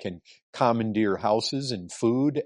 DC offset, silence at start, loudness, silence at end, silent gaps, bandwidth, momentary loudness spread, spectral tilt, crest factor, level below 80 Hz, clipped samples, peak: under 0.1%; 0 s; -26 LUFS; 0 s; 0.43-0.53 s; 11.5 kHz; 14 LU; -5.5 dB/octave; 18 dB; -66 dBFS; under 0.1%; -8 dBFS